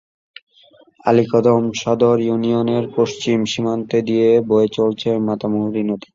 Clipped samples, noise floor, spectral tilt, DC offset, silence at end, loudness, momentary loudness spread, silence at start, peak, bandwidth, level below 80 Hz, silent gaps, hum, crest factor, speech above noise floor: under 0.1%; -51 dBFS; -6.5 dB/octave; under 0.1%; 0.15 s; -17 LUFS; 5 LU; 1.05 s; -2 dBFS; 7.6 kHz; -56 dBFS; none; none; 16 dB; 34 dB